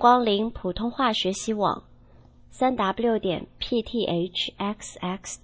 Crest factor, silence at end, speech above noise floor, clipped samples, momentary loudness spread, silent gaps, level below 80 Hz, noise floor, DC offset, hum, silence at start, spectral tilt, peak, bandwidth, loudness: 20 dB; 0.05 s; 27 dB; under 0.1%; 8 LU; none; -50 dBFS; -52 dBFS; under 0.1%; none; 0 s; -4.5 dB/octave; -4 dBFS; 8 kHz; -26 LUFS